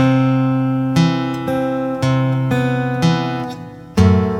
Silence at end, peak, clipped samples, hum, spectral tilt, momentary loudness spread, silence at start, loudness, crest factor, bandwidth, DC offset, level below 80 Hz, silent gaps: 0 s; -2 dBFS; under 0.1%; none; -7.5 dB/octave; 9 LU; 0 s; -17 LUFS; 14 dB; 12.5 kHz; under 0.1%; -42 dBFS; none